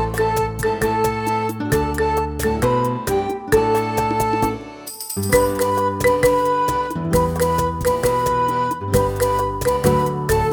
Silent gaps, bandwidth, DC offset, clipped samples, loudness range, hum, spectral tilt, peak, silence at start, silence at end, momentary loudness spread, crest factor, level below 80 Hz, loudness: none; 19 kHz; under 0.1%; under 0.1%; 2 LU; none; -5.5 dB/octave; 0 dBFS; 0 s; 0 s; 5 LU; 18 dB; -34 dBFS; -19 LUFS